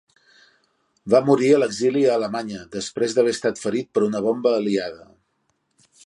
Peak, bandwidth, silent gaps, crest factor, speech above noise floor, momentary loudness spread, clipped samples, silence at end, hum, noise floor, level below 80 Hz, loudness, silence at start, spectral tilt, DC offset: -4 dBFS; 11.5 kHz; none; 18 dB; 50 dB; 13 LU; under 0.1%; 1.1 s; none; -70 dBFS; -64 dBFS; -21 LUFS; 1.05 s; -5 dB/octave; under 0.1%